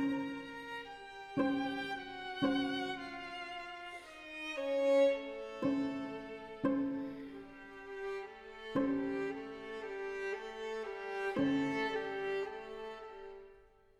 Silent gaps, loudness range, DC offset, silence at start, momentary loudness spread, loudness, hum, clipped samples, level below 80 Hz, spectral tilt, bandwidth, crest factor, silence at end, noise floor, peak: none; 5 LU; under 0.1%; 0 s; 15 LU; -38 LUFS; none; under 0.1%; -68 dBFS; -5.5 dB/octave; 10.5 kHz; 18 dB; 0.3 s; -62 dBFS; -20 dBFS